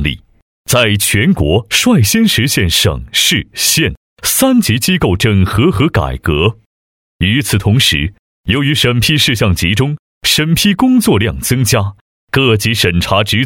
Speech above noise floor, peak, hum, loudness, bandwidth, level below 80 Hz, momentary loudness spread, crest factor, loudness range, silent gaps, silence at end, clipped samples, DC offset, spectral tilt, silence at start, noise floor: over 79 dB; 0 dBFS; none; -11 LUFS; 17.5 kHz; -30 dBFS; 7 LU; 12 dB; 2 LU; 0.42-0.65 s, 3.97-4.17 s, 6.66-7.19 s, 8.19-8.44 s, 9.99-10.21 s, 12.01-12.28 s; 0 s; under 0.1%; under 0.1%; -4 dB/octave; 0 s; under -90 dBFS